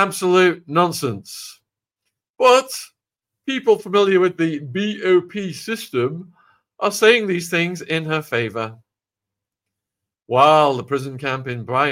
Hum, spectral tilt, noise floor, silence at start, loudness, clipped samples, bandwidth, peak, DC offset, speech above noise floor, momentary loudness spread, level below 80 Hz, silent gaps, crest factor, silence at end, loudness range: none; -4.5 dB/octave; -86 dBFS; 0 s; -18 LUFS; under 0.1%; 16.5 kHz; -2 dBFS; under 0.1%; 68 dB; 14 LU; -68 dBFS; 2.30-2.34 s; 18 dB; 0 s; 2 LU